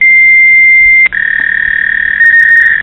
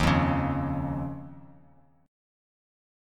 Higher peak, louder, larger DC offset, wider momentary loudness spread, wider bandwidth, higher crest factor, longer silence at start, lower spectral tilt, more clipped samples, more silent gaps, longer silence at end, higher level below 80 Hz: first, 0 dBFS vs -10 dBFS; first, -4 LUFS vs -28 LUFS; first, 0.2% vs under 0.1%; second, 7 LU vs 17 LU; second, 9.6 kHz vs 13 kHz; second, 6 dB vs 22 dB; about the same, 0 s vs 0 s; second, -2.5 dB/octave vs -7 dB/octave; first, 0.3% vs under 0.1%; neither; second, 0 s vs 1.6 s; about the same, -38 dBFS vs -42 dBFS